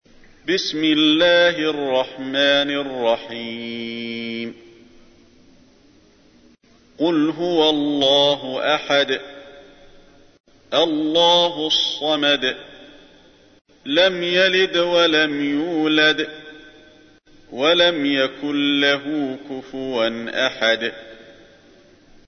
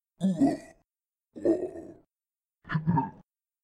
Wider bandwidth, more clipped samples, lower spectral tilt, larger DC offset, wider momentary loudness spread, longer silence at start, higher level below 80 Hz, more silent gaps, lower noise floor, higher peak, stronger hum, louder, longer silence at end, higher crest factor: second, 6.6 kHz vs 10.5 kHz; neither; second, -3.5 dB/octave vs -8.5 dB/octave; neither; about the same, 13 LU vs 13 LU; first, 0.45 s vs 0.2 s; about the same, -58 dBFS vs -62 dBFS; first, 10.40-10.44 s, 13.61-13.65 s vs none; second, -53 dBFS vs under -90 dBFS; first, -4 dBFS vs -14 dBFS; neither; first, -18 LUFS vs -30 LUFS; first, 0.95 s vs 0.55 s; about the same, 18 dB vs 18 dB